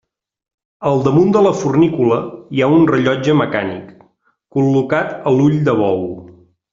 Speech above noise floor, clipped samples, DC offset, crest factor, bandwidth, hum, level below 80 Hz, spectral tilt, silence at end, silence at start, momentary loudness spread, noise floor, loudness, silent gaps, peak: 43 dB; under 0.1%; under 0.1%; 14 dB; 7.6 kHz; none; -52 dBFS; -7.5 dB/octave; 0.45 s; 0.8 s; 11 LU; -57 dBFS; -15 LUFS; none; -2 dBFS